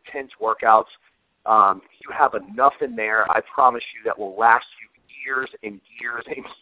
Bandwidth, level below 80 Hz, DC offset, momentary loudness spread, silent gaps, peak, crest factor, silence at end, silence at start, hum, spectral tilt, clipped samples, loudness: 4 kHz; -64 dBFS; under 0.1%; 17 LU; none; 0 dBFS; 20 dB; 0.1 s; 0.05 s; none; -7 dB/octave; under 0.1%; -20 LUFS